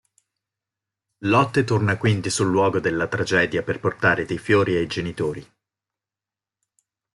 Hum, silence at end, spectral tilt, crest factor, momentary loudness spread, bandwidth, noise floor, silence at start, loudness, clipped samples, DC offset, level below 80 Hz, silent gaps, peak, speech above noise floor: none; 1.7 s; -5.5 dB/octave; 20 dB; 8 LU; 11.5 kHz; -90 dBFS; 1.2 s; -21 LUFS; under 0.1%; under 0.1%; -54 dBFS; none; -4 dBFS; 69 dB